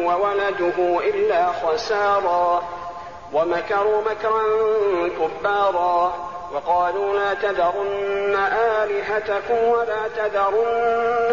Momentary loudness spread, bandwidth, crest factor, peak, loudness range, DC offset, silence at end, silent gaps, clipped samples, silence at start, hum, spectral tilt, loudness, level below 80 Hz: 5 LU; 7.2 kHz; 10 dB; -10 dBFS; 1 LU; 0.4%; 0 s; none; under 0.1%; 0 s; none; -2 dB/octave; -21 LUFS; -54 dBFS